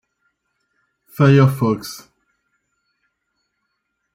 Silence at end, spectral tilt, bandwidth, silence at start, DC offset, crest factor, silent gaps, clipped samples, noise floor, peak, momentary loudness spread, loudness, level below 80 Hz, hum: 2.15 s; -7.5 dB/octave; 15.5 kHz; 1.2 s; under 0.1%; 18 dB; none; under 0.1%; -74 dBFS; -2 dBFS; 24 LU; -16 LUFS; -58 dBFS; none